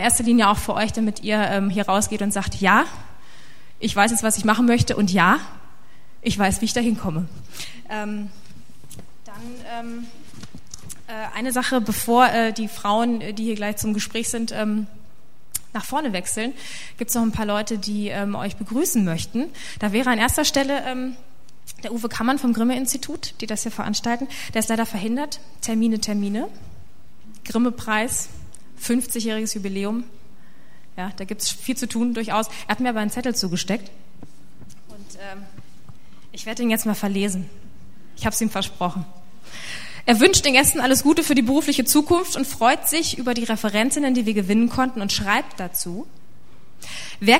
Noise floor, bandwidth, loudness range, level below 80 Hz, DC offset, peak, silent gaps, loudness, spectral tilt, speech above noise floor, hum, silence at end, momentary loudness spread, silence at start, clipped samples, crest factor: -55 dBFS; 16 kHz; 9 LU; -46 dBFS; 3%; 0 dBFS; none; -21 LUFS; -3.5 dB/octave; 33 dB; none; 0 s; 18 LU; 0 s; under 0.1%; 22 dB